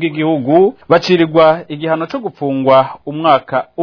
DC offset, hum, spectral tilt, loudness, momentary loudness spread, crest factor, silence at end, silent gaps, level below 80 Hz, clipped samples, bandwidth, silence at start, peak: under 0.1%; none; -7 dB/octave; -13 LUFS; 9 LU; 12 dB; 0 s; none; -54 dBFS; under 0.1%; 5.4 kHz; 0 s; 0 dBFS